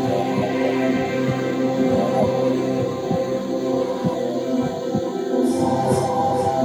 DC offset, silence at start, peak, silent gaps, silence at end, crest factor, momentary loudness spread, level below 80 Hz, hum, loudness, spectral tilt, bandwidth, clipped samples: under 0.1%; 0 s; -6 dBFS; none; 0 s; 14 dB; 4 LU; -54 dBFS; none; -21 LUFS; -6.5 dB/octave; 16 kHz; under 0.1%